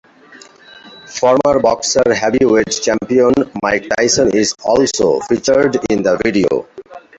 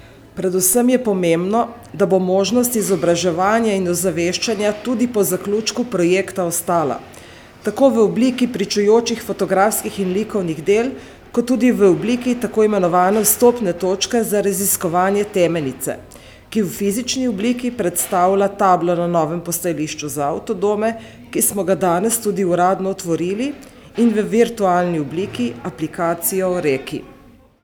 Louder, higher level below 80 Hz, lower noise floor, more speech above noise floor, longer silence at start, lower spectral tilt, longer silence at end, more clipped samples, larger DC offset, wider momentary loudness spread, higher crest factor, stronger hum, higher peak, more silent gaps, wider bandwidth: first, -14 LUFS vs -18 LUFS; first, -46 dBFS vs -52 dBFS; second, -41 dBFS vs -46 dBFS; about the same, 28 dB vs 29 dB; first, 0.35 s vs 0.05 s; about the same, -3.5 dB/octave vs -4.5 dB/octave; second, 0.2 s vs 0.5 s; neither; neither; second, 4 LU vs 9 LU; about the same, 14 dB vs 16 dB; neither; about the same, 0 dBFS vs 0 dBFS; neither; second, 8.2 kHz vs over 20 kHz